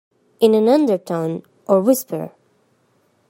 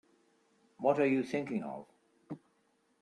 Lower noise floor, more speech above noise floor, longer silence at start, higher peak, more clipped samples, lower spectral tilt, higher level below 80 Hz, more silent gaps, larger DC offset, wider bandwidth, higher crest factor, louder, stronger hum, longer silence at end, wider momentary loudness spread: second, -61 dBFS vs -74 dBFS; about the same, 45 dB vs 42 dB; second, 0.4 s vs 0.8 s; first, 0 dBFS vs -14 dBFS; neither; about the same, -6 dB/octave vs -7 dB/octave; first, -72 dBFS vs -80 dBFS; neither; neither; first, 16.5 kHz vs 10.5 kHz; about the same, 18 dB vs 22 dB; first, -18 LUFS vs -33 LUFS; neither; first, 1 s vs 0.65 s; second, 14 LU vs 20 LU